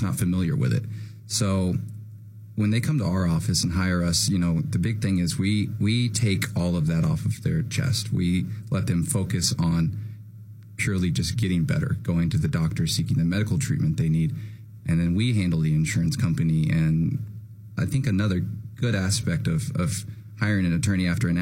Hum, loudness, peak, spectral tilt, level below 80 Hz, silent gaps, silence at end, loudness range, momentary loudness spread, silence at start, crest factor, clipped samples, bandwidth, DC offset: none; -24 LUFS; -6 dBFS; -5.5 dB/octave; -44 dBFS; none; 0 s; 2 LU; 10 LU; 0 s; 18 dB; under 0.1%; 16.5 kHz; under 0.1%